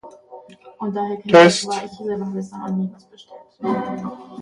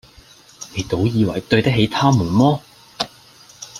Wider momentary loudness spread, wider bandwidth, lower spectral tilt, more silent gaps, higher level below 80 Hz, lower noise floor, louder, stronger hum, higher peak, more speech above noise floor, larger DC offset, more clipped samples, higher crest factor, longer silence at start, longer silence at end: first, 18 LU vs 13 LU; second, 11 kHz vs 15 kHz; about the same, -5 dB/octave vs -6 dB/octave; neither; second, -62 dBFS vs -46 dBFS; second, -43 dBFS vs -47 dBFS; about the same, -19 LUFS vs -18 LUFS; neither; about the same, 0 dBFS vs -2 dBFS; second, 24 dB vs 30 dB; neither; neither; about the same, 20 dB vs 18 dB; second, 0.05 s vs 0.6 s; about the same, 0 s vs 0 s